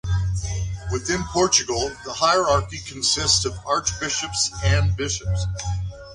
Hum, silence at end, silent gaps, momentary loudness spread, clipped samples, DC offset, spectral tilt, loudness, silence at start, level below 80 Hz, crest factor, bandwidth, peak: none; 0 s; none; 10 LU; under 0.1%; under 0.1%; -3 dB/octave; -22 LUFS; 0.05 s; -34 dBFS; 20 dB; 11 kHz; -2 dBFS